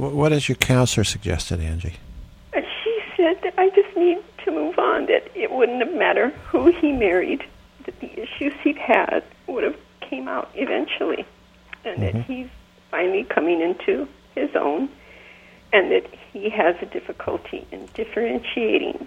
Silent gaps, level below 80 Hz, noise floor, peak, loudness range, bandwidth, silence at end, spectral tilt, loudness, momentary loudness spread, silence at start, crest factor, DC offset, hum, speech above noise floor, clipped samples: none; -44 dBFS; -47 dBFS; 0 dBFS; 5 LU; 15.5 kHz; 0 s; -5.5 dB/octave; -22 LUFS; 15 LU; 0 s; 22 dB; under 0.1%; none; 26 dB; under 0.1%